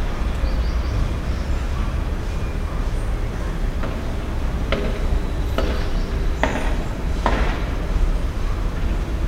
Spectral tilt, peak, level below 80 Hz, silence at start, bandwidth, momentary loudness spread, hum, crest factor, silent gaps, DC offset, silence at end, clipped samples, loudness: -6.5 dB/octave; 0 dBFS; -22 dBFS; 0 s; 13 kHz; 4 LU; none; 20 dB; none; under 0.1%; 0 s; under 0.1%; -25 LUFS